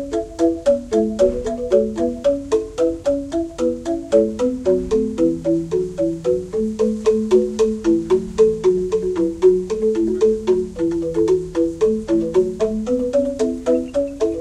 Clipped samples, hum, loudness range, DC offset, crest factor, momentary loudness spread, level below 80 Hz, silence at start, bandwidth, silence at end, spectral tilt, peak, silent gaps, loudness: under 0.1%; none; 2 LU; under 0.1%; 16 dB; 6 LU; -40 dBFS; 0 s; 11 kHz; 0 s; -7 dB/octave; -2 dBFS; none; -19 LUFS